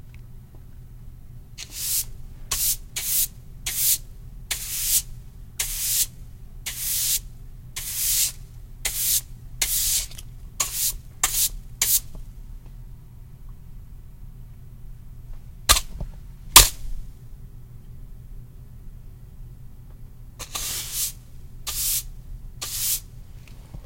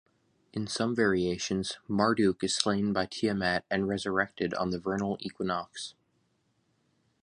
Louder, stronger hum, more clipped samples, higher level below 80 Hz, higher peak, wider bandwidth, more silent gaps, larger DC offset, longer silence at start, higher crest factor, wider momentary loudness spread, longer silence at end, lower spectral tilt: first, -22 LUFS vs -30 LUFS; neither; neither; first, -38 dBFS vs -58 dBFS; first, 0 dBFS vs -6 dBFS; first, 16.5 kHz vs 11 kHz; neither; neither; second, 0 s vs 0.55 s; about the same, 28 dB vs 24 dB; first, 24 LU vs 8 LU; second, 0 s vs 1.3 s; second, 0 dB/octave vs -4.5 dB/octave